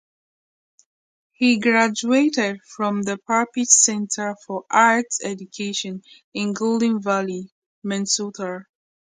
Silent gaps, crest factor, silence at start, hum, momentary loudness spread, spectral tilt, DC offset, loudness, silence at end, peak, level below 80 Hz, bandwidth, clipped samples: 6.24-6.32 s, 7.52-7.82 s; 22 dB; 1.4 s; none; 15 LU; -2.5 dB/octave; under 0.1%; -20 LUFS; 0.5 s; 0 dBFS; -72 dBFS; 9.6 kHz; under 0.1%